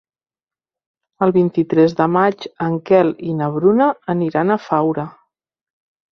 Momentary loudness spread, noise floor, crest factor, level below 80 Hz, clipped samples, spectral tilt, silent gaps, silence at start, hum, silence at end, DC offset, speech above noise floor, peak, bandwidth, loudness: 8 LU; under -90 dBFS; 16 dB; -60 dBFS; under 0.1%; -9 dB/octave; none; 1.2 s; none; 1.05 s; under 0.1%; over 74 dB; -2 dBFS; 6.4 kHz; -17 LUFS